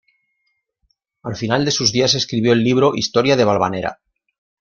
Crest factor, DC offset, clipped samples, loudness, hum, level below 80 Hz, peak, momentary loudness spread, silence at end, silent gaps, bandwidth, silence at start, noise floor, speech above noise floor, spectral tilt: 18 dB; under 0.1%; under 0.1%; -16 LUFS; none; -54 dBFS; -2 dBFS; 11 LU; 0.7 s; none; 7.4 kHz; 1.25 s; -70 dBFS; 54 dB; -4.5 dB/octave